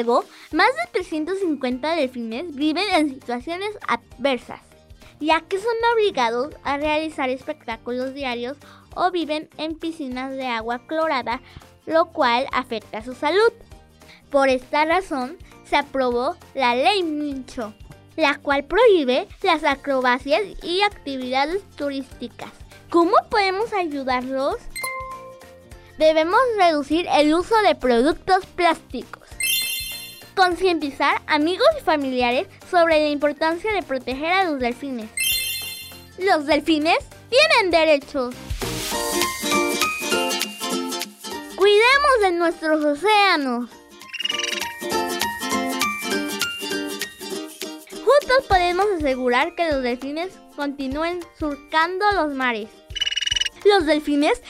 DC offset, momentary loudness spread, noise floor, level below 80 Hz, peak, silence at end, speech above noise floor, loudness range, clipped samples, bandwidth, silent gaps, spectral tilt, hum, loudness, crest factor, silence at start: under 0.1%; 13 LU; -48 dBFS; -46 dBFS; -2 dBFS; 0 s; 28 dB; 5 LU; under 0.1%; 16 kHz; none; -3 dB/octave; none; -21 LUFS; 20 dB; 0 s